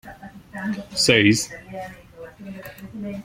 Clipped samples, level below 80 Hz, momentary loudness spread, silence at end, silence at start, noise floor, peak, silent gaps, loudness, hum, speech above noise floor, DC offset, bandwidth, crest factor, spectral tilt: under 0.1%; -54 dBFS; 26 LU; 0 s; 0.05 s; -41 dBFS; -2 dBFS; none; -20 LUFS; none; 21 dB; under 0.1%; 16.5 kHz; 22 dB; -3.5 dB/octave